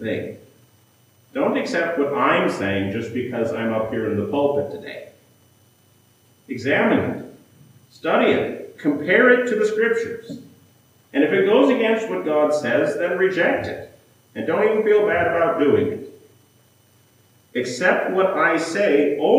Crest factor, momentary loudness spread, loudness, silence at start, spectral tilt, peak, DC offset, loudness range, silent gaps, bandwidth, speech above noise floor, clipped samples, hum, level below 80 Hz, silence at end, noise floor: 18 dB; 14 LU; -20 LUFS; 0 s; -5.5 dB/octave; -2 dBFS; under 0.1%; 6 LU; none; 15.5 kHz; 37 dB; under 0.1%; none; -66 dBFS; 0 s; -57 dBFS